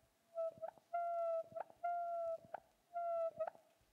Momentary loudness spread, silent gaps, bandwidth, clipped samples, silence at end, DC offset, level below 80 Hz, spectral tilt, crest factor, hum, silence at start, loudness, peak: 11 LU; none; 7.6 kHz; under 0.1%; 0.4 s; under 0.1%; -90 dBFS; -5.5 dB/octave; 12 dB; none; 0.35 s; -44 LUFS; -32 dBFS